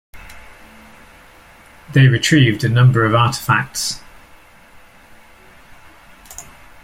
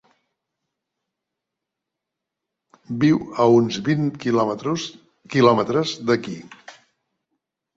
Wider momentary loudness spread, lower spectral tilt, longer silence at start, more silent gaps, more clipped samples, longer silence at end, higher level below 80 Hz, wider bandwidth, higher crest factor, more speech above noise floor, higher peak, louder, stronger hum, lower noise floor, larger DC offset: first, 23 LU vs 13 LU; second, -5 dB/octave vs -6.5 dB/octave; second, 0.15 s vs 2.9 s; neither; neither; second, 0.4 s vs 1.05 s; first, -46 dBFS vs -62 dBFS; first, 15.5 kHz vs 7.8 kHz; about the same, 16 dB vs 20 dB; second, 31 dB vs 64 dB; about the same, -2 dBFS vs -2 dBFS; first, -14 LUFS vs -20 LUFS; neither; second, -45 dBFS vs -84 dBFS; neither